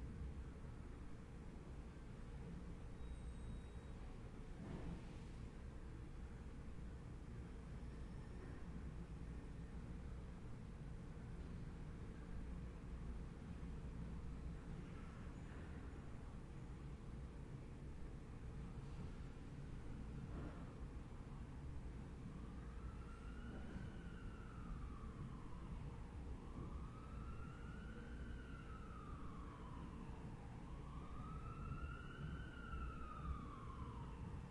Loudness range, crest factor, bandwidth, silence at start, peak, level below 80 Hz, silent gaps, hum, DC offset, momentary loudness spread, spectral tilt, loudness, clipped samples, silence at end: 2 LU; 18 dB; 11 kHz; 0 s; -34 dBFS; -54 dBFS; none; none; under 0.1%; 4 LU; -7.5 dB/octave; -54 LUFS; under 0.1%; 0 s